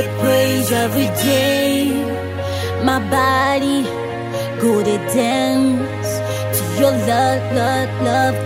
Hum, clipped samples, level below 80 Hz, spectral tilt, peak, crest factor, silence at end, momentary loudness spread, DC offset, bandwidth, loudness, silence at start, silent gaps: none; under 0.1%; -48 dBFS; -5 dB/octave; -2 dBFS; 14 dB; 0 s; 7 LU; under 0.1%; 16.5 kHz; -17 LUFS; 0 s; none